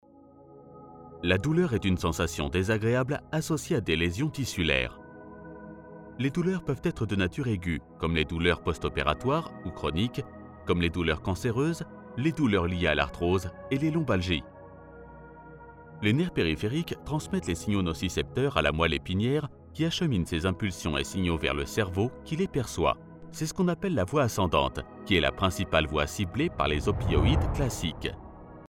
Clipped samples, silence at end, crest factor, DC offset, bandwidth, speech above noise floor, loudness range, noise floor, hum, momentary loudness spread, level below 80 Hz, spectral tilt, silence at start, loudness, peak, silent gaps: under 0.1%; 0.05 s; 20 dB; under 0.1%; 16.5 kHz; 26 dB; 3 LU; -54 dBFS; none; 18 LU; -42 dBFS; -5.5 dB/octave; 0.5 s; -28 LUFS; -8 dBFS; none